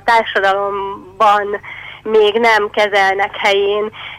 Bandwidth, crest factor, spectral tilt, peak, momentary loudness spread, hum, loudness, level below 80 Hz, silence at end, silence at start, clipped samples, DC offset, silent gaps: 15 kHz; 10 dB; -3 dB/octave; -4 dBFS; 11 LU; 50 Hz at -50 dBFS; -14 LUFS; -52 dBFS; 0 s; 0.05 s; under 0.1%; under 0.1%; none